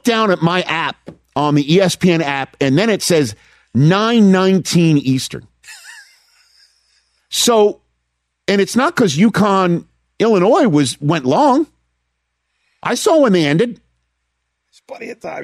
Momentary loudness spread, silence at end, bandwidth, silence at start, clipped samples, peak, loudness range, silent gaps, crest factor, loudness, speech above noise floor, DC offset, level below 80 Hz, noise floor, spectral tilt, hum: 14 LU; 0 s; 15 kHz; 0.05 s; under 0.1%; -2 dBFS; 4 LU; none; 12 dB; -14 LUFS; 58 dB; under 0.1%; -56 dBFS; -71 dBFS; -5 dB/octave; none